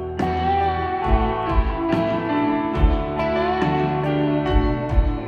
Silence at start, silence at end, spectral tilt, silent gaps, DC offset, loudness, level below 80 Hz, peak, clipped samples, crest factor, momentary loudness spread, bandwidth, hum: 0 s; 0 s; -8.5 dB/octave; none; under 0.1%; -21 LUFS; -26 dBFS; -4 dBFS; under 0.1%; 16 dB; 2 LU; 6.4 kHz; none